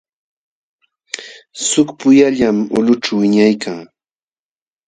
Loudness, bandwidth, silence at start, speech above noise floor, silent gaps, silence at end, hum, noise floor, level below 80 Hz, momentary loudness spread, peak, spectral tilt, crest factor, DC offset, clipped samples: -13 LUFS; 9.6 kHz; 1.15 s; over 77 dB; none; 1 s; none; under -90 dBFS; -56 dBFS; 18 LU; 0 dBFS; -4.5 dB/octave; 16 dB; under 0.1%; under 0.1%